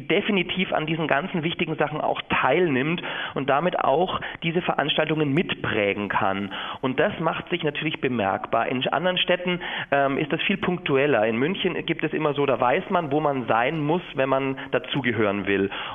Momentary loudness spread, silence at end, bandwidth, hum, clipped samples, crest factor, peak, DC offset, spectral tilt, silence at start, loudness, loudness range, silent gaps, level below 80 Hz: 5 LU; 0 s; 3.9 kHz; none; under 0.1%; 22 dB; -2 dBFS; under 0.1%; -8.5 dB/octave; 0 s; -24 LUFS; 2 LU; none; -56 dBFS